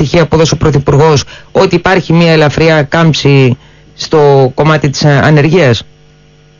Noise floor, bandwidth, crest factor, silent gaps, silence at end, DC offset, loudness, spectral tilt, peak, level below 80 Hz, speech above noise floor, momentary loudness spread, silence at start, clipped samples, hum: -41 dBFS; 7.4 kHz; 8 dB; none; 0.75 s; under 0.1%; -8 LUFS; -6 dB/octave; 0 dBFS; -32 dBFS; 34 dB; 6 LU; 0 s; 0.2%; none